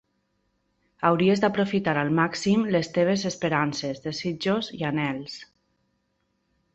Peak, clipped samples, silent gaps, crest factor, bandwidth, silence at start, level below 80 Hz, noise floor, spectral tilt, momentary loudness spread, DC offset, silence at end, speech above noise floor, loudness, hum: -6 dBFS; under 0.1%; none; 20 dB; 8.2 kHz; 1 s; -62 dBFS; -73 dBFS; -5.5 dB/octave; 9 LU; under 0.1%; 1.3 s; 49 dB; -25 LUFS; none